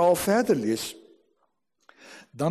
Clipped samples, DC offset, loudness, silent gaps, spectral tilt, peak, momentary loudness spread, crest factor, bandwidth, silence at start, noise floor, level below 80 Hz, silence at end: under 0.1%; under 0.1%; -25 LUFS; none; -5 dB/octave; -10 dBFS; 25 LU; 16 dB; 13 kHz; 0 s; -74 dBFS; -64 dBFS; 0 s